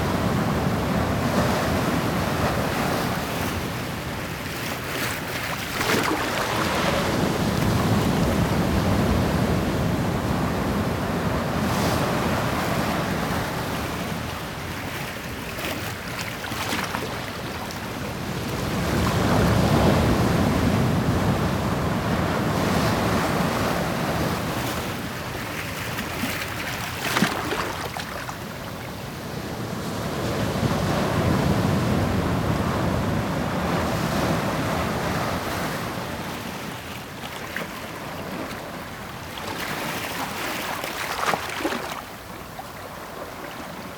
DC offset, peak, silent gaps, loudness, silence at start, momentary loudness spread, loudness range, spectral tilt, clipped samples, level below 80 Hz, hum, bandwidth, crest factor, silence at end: under 0.1%; -6 dBFS; none; -25 LUFS; 0 s; 11 LU; 7 LU; -5 dB/octave; under 0.1%; -38 dBFS; none; over 20 kHz; 20 dB; 0 s